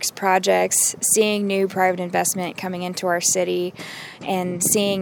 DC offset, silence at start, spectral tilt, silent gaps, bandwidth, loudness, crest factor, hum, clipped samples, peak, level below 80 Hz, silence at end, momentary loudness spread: under 0.1%; 0 s; -3 dB/octave; none; over 20 kHz; -20 LUFS; 18 dB; none; under 0.1%; -4 dBFS; -66 dBFS; 0 s; 10 LU